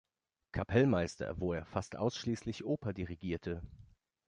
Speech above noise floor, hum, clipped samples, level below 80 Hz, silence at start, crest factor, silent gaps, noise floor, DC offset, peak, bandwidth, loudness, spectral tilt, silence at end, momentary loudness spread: 31 dB; none; under 0.1%; -54 dBFS; 0.55 s; 20 dB; none; -67 dBFS; under 0.1%; -16 dBFS; 10.5 kHz; -36 LUFS; -6.5 dB/octave; 0.4 s; 12 LU